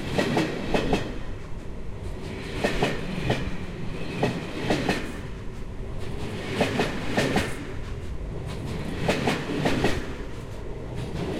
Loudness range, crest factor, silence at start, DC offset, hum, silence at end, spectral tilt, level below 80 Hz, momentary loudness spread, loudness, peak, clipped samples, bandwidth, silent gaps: 2 LU; 20 dB; 0 s; under 0.1%; none; 0 s; -5.5 dB/octave; -38 dBFS; 13 LU; -29 LUFS; -8 dBFS; under 0.1%; 16 kHz; none